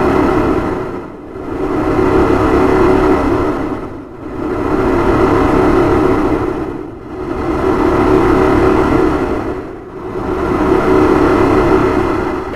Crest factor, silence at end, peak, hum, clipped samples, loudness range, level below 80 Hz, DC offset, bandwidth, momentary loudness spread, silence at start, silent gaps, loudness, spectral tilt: 12 dB; 0 s; 0 dBFS; none; under 0.1%; 1 LU; -26 dBFS; under 0.1%; 13.5 kHz; 14 LU; 0 s; none; -13 LUFS; -7.5 dB/octave